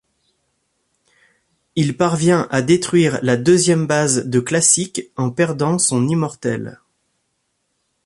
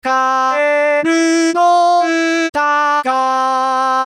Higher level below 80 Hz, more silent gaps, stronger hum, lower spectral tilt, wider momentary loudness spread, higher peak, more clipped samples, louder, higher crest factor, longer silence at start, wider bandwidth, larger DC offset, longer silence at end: first, -56 dBFS vs -62 dBFS; second, none vs 2.49-2.53 s; neither; first, -4.5 dB/octave vs -2 dB/octave; first, 10 LU vs 3 LU; about the same, -2 dBFS vs -4 dBFS; neither; second, -17 LUFS vs -13 LUFS; first, 18 dB vs 8 dB; first, 1.75 s vs 0.05 s; about the same, 11.5 kHz vs 11.5 kHz; neither; first, 1.35 s vs 0 s